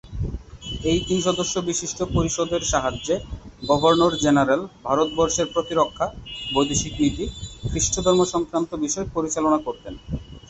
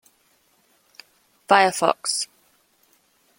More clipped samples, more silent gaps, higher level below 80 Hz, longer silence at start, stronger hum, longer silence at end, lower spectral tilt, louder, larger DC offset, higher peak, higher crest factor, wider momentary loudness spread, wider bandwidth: neither; neither; first, -38 dBFS vs -74 dBFS; second, 0.05 s vs 1.5 s; neither; second, 0 s vs 1.15 s; first, -4 dB/octave vs -2 dB/octave; about the same, -22 LUFS vs -20 LUFS; neither; about the same, -4 dBFS vs -2 dBFS; second, 18 dB vs 24 dB; first, 14 LU vs 10 LU; second, 8.2 kHz vs 16.5 kHz